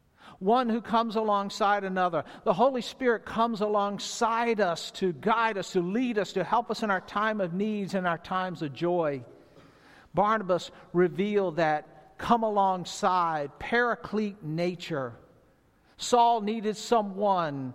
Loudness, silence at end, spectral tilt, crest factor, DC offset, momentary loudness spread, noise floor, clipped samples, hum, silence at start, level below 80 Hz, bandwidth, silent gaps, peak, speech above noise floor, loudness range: -28 LUFS; 0 s; -5 dB/octave; 20 dB; under 0.1%; 7 LU; -63 dBFS; under 0.1%; none; 0.25 s; -62 dBFS; 14.5 kHz; none; -8 dBFS; 36 dB; 3 LU